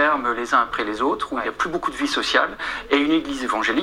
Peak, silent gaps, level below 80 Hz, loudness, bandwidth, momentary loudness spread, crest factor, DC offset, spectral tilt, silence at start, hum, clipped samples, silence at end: -2 dBFS; none; -50 dBFS; -21 LUFS; 15.5 kHz; 5 LU; 20 dB; under 0.1%; -3 dB/octave; 0 s; none; under 0.1%; 0 s